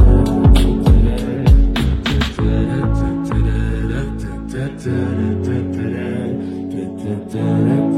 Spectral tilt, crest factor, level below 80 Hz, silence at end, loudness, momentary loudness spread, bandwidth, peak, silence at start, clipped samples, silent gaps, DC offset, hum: -7.5 dB/octave; 14 dB; -18 dBFS; 0 s; -18 LUFS; 12 LU; 12 kHz; 0 dBFS; 0 s; under 0.1%; none; under 0.1%; none